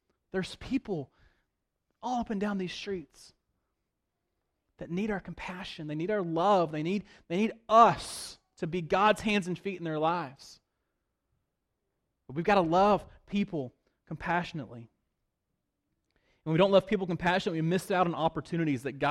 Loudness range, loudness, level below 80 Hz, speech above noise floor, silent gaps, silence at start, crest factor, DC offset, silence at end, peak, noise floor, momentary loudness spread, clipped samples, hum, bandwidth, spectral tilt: 10 LU; -30 LUFS; -60 dBFS; 54 dB; none; 0.35 s; 22 dB; under 0.1%; 0 s; -8 dBFS; -83 dBFS; 16 LU; under 0.1%; none; 14 kHz; -6 dB/octave